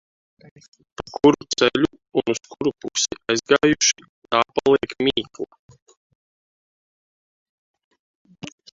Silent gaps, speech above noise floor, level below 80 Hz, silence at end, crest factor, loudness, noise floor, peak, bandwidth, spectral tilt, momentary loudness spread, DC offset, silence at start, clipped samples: 4.09-4.22 s, 5.59-5.69 s, 5.82-5.86 s, 5.97-7.74 s, 7.84-7.91 s, 7.99-8.25 s; over 69 dB; -56 dBFS; 0.25 s; 22 dB; -20 LUFS; under -90 dBFS; 0 dBFS; 7.8 kHz; -3 dB/octave; 18 LU; under 0.1%; 1 s; under 0.1%